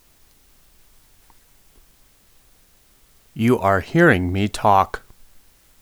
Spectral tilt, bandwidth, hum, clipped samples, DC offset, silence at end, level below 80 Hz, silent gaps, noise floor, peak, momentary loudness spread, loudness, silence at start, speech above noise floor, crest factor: -6.5 dB/octave; over 20 kHz; none; under 0.1%; under 0.1%; 0.85 s; -48 dBFS; none; -55 dBFS; 0 dBFS; 11 LU; -18 LUFS; 3.35 s; 38 dB; 22 dB